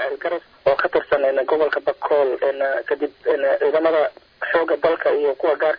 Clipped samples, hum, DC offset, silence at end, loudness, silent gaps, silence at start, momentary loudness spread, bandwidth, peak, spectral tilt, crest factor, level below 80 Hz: under 0.1%; none; under 0.1%; 0 s; -20 LUFS; none; 0 s; 6 LU; 5.2 kHz; -6 dBFS; -6.5 dB/octave; 14 dB; -60 dBFS